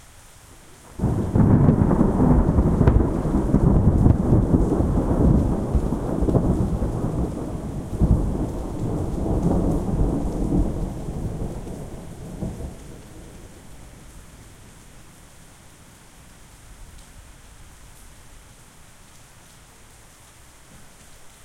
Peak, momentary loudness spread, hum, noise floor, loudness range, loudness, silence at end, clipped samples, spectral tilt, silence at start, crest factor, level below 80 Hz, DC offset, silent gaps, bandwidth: -2 dBFS; 18 LU; none; -48 dBFS; 17 LU; -22 LUFS; 0.15 s; under 0.1%; -9 dB/octave; 0.7 s; 20 dB; -28 dBFS; under 0.1%; none; 14 kHz